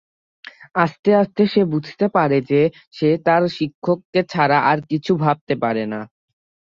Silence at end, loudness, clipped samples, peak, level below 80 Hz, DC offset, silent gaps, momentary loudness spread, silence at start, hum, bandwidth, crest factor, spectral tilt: 0.7 s; -19 LUFS; under 0.1%; -2 dBFS; -60 dBFS; under 0.1%; 0.99-1.03 s, 2.87-2.91 s, 3.74-3.82 s, 4.05-4.13 s, 5.41-5.47 s; 7 LU; 0.75 s; none; 7.4 kHz; 18 dB; -8 dB/octave